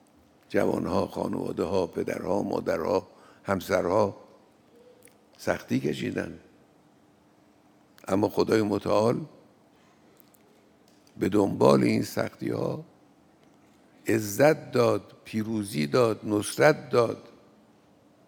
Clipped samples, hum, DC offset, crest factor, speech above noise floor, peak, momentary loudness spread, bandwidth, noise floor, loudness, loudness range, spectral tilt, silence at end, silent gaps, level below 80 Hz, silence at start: under 0.1%; none; under 0.1%; 24 dB; 34 dB; -4 dBFS; 11 LU; over 20 kHz; -60 dBFS; -27 LUFS; 6 LU; -6 dB/octave; 1.05 s; none; -68 dBFS; 0.5 s